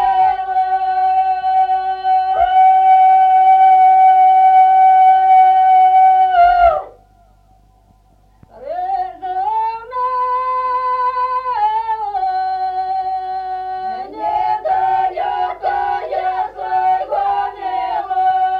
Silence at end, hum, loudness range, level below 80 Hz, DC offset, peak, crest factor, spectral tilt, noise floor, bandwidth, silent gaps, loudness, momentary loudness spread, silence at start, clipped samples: 0 s; 50 Hz at -55 dBFS; 11 LU; -48 dBFS; under 0.1%; -2 dBFS; 12 dB; -4.5 dB/octave; -51 dBFS; 4.8 kHz; none; -14 LUFS; 12 LU; 0 s; under 0.1%